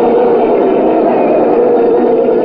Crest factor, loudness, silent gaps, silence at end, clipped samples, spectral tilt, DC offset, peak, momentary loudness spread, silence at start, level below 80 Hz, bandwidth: 8 dB; -10 LUFS; none; 0 s; under 0.1%; -10.5 dB/octave; under 0.1%; 0 dBFS; 1 LU; 0 s; -46 dBFS; 4.9 kHz